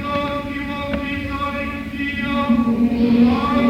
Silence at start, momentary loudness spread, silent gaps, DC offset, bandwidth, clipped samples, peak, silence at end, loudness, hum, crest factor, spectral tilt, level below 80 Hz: 0 s; 10 LU; none; under 0.1%; 7.6 kHz; under 0.1%; -4 dBFS; 0 s; -20 LUFS; none; 14 dB; -7 dB/octave; -36 dBFS